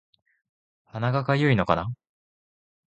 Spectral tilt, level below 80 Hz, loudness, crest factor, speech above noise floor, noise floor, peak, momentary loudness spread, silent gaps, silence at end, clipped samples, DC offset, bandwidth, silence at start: -8 dB/octave; -52 dBFS; -24 LUFS; 24 dB; over 67 dB; under -90 dBFS; -4 dBFS; 17 LU; none; 0.95 s; under 0.1%; under 0.1%; 8.4 kHz; 0.95 s